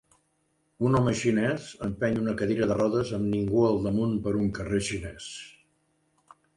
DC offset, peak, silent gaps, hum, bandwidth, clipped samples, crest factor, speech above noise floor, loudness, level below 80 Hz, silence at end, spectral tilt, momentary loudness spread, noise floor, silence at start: under 0.1%; -12 dBFS; none; none; 11.5 kHz; under 0.1%; 16 dB; 46 dB; -27 LUFS; -50 dBFS; 1.05 s; -6.5 dB/octave; 12 LU; -72 dBFS; 0.8 s